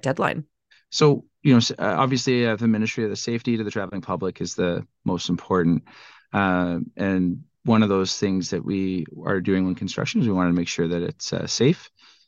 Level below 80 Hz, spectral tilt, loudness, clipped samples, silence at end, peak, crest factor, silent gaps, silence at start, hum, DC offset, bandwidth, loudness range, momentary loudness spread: -58 dBFS; -5.5 dB/octave; -23 LUFS; under 0.1%; 0.4 s; -4 dBFS; 18 dB; none; 0.05 s; none; under 0.1%; 8.6 kHz; 3 LU; 9 LU